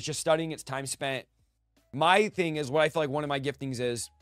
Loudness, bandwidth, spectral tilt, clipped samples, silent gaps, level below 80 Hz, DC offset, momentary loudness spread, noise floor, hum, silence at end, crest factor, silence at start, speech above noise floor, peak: -29 LUFS; 15.5 kHz; -4 dB/octave; under 0.1%; none; -64 dBFS; under 0.1%; 11 LU; -70 dBFS; none; 0.15 s; 22 dB; 0 s; 41 dB; -8 dBFS